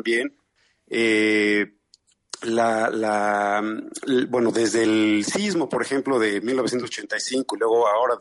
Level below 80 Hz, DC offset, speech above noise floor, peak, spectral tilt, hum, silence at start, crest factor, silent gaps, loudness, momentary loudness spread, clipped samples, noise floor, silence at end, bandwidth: -68 dBFS; under 0.1%; 43 dB; -10 dBFS; -4 dB/octave; none; 0.05 s; 14 dB; none; -22 LUFS; 9 LU; under 0.1%; -65 dBFS; 0 s; 11.5 kHz